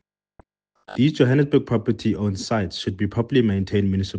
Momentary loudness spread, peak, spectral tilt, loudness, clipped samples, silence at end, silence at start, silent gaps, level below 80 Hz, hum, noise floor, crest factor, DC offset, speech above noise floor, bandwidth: 7 LU; -4 dBFS; -7 dB/octave; -21 LUFS; under 0.1%; 0 s; 0.9 s; none; -52 dBFS; none; -57 dBFS; 18 dB; under 0.1%; 36 dB; 9.4 kHz